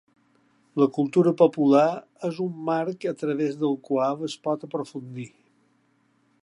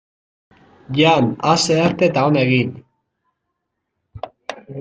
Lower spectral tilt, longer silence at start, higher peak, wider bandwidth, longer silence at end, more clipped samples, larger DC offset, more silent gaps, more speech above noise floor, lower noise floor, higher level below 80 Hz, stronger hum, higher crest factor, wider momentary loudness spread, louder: first, -7.5 dB/octave vs -5 dB/octave; second, 0.75 s vs 0.9 s; about the same, -4 dBFS vs -2 dBFS; first, 11 kHz vs 9.4 kHz; first, 1.15 s vs 0 s; neither; neither; neither; second, 42 dB vs 60 dB; second, -66 dBFS vs -76 dBFS; second, -80 dBFS vs -56 dBFS; neither; about the same, 20 dB vs 18 dB; second, 15 LU vs 18 LU; second, -24 LUFS vs -16 LUFS